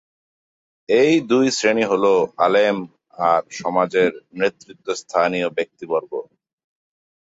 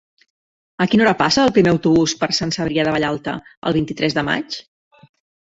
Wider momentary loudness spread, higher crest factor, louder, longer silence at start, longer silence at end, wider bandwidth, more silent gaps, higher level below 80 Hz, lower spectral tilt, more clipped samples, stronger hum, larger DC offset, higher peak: about the same, 12 LU vs 11 LU; about the same, 16 dB vs 18 dB; about the same, -19 LUFS vs -18 LUFS; about the same, 0.9 s vs 0.8 s; about the same, 1 s vs 0.9 s; about the same, 8 kHz vs 8 kHz; second, none vs 3.57-3.62 s; second, -66 dBFS vs -50 dBFS; about the same, -4.5 dB/octave vs -5 dB/octave; neither; neither; neither; about the same, -4 dBFS vs -2 dBFS